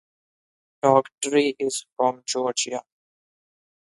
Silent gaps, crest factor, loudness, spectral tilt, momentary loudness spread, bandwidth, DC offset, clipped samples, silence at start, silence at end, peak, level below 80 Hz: 1.14-1.18 s, 1.92-1.96 s; 22 dB; -23 LUFS; -3 dB/octave; 8 LU; 11.5 kHz; under 0.1%; under 0.1%; 0.85 s; 1.05 s; -4 dBFS; -76 dBFS